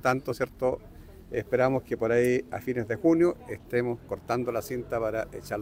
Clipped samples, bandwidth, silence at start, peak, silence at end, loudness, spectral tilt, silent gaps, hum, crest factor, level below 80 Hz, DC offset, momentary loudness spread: under 0.1%; 16 kHz; 0.05 s; -10 dBFS; 0 s; -28 LUFS; -7 dB/octave; none; none; 18 dB; -54 dBFS; under 0.1%; 10 LU